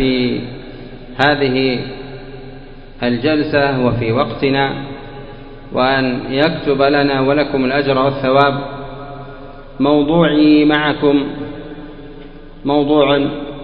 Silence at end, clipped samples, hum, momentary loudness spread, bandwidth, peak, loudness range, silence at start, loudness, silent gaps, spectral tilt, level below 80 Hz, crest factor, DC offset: 0 s; under 0.1%; none; 21 LU; 5.4 kHz; 0 dBFS; 3 LU; 0 s; -15 LUFS; none; -8.5 dB/octave; -40 dBFS; 16 dB; under 0.1%